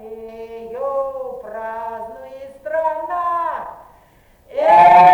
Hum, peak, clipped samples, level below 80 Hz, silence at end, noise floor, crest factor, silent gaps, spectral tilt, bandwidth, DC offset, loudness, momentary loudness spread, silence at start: none; -2 dBFS; under 0.1%; -54 dBFS; 0 s; -51 dBFS; 16 dB; none; -5.5 dB/octave; 9 kHz; under 0.1%; -17 LUFS; 23 LU; 0 s